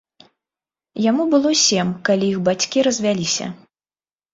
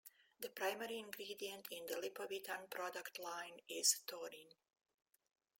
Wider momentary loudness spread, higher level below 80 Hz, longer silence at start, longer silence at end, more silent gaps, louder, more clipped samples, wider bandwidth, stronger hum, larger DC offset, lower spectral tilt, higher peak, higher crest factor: second, 7 LU vs 16 LU; first, -62 dBFS vs under -90 dBFS; first, 0.95 s vs 0.05 s; second, 0.8 s vs 1.1 s; neither; first, -18 LUFS vs -44 LUFS; neither; second, 7.8 kHz vs 16.5 kHz; neither; neither; first, -3.5 dB/octave vs 0 dB/octave; first, -4 dBFS vs -20 dBFS; second, 16 dB vs 26 dB